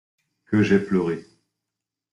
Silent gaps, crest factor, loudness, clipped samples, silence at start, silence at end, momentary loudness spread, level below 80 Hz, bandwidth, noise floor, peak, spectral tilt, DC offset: none; 18 dB; -22 LUFS; under 0.1%; 0.5 s; 0.9 s; 9 LU; -60 dBFS; 10 kHz; -86 dBFS; -6 dBFS; -7.5 dB/octave; under 0.1%